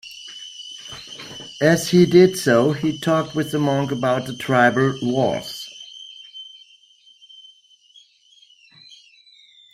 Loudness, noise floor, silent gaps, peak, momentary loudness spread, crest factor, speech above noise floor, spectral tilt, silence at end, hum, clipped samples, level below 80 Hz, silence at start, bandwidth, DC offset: -18 LUFS; -54 dBFS; none; -2 dBFS; 22 LU; 20 dB; 36 dB; -5.5 dB/octave; 3.25 s; none; under 0.1%; -60 dBFS; 0.05 s; 15.5 kHz; under 0.1%